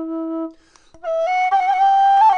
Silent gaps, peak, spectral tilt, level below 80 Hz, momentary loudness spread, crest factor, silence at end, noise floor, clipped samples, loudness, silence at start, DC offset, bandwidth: none; -6 dBFS; -2.5 dB/octave; -60 dBFS; 16 LU; 10 dB; 0 s; -49 dBFS; under 0.1%; -17 LUFS; 0 s; under 0.1%; 6.8 kHz